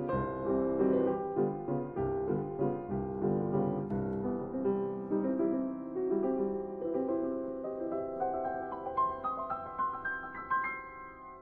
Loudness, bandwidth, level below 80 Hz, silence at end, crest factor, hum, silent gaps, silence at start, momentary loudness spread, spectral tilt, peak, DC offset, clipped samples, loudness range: -34 LUFS; 4 kHz; -58 dBFS; 0 s; 16 dB; none; none; 0 s; 6 LU; -8.5 dB/octave; -18 dBFS; under 0.1%; under 0.1%; 3 LU